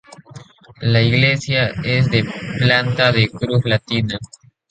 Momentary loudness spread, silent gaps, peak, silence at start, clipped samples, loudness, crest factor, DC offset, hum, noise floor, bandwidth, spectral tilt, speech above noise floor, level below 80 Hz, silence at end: 8 LU; none; 0 dBFS; 0.35 s; under 0.1%; -17 LUFS; 18 dB; under 0.1%; none; -41 dBFS; 9 kHz; -6 dB/octave; 24 dB; -44 dBFS; 0.45 s